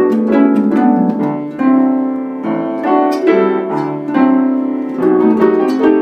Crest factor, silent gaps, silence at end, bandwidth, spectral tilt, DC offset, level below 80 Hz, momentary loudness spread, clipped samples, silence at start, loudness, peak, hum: 12 dB; none; 0 s; 6.4 kHz; -8.5 dB/octave; under 0.1%; -60 dBFS; 7 LU; under 0.1%; 0 s; -13 LUFS; 0 dBFS; none